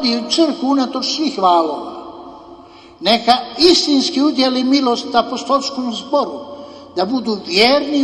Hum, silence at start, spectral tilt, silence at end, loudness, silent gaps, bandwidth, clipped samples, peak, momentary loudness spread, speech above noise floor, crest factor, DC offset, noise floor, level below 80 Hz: none; 0 s; -3 dB/octave; 0 s; -15 LUFS; none; 12.5 kHz; under 0.1%; 0 dBFS; 15 LU; 25 dB; 16 dB; under 0.1%; -40 dBFS; -54 dBFS